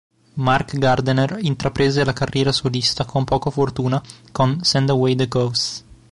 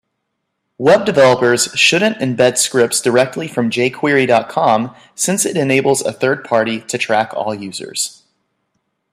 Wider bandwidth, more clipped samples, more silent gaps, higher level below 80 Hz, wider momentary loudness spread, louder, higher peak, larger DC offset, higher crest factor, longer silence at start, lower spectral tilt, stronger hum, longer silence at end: second, 11.5 kHz vs 15.5 kHz; neither; neither; first, -44 dBFS vs -60 dBFS; second, 6 LU vs 9 LU; second, -19 LUFS vs -14 LUFS; second, -6 dBFS vs 0 dBFS; neither; about the same, 14 dB vs 16 dB; second, 0.35 s vs 0.8 s; first, -5.5 dB/octave vs -3.5 dB/octave; neither; second, 0.15 s vs 1 s